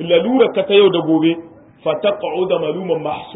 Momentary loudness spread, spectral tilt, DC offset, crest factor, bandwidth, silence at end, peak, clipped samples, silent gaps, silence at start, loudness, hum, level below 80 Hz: 9 LU; -11 dB/octave; under 0.1%; 14 dB; 4 kHz; 0 s; -2 dBFS; under 0.1%; none; 0 s; -16 LUFS; none; -60 dBFS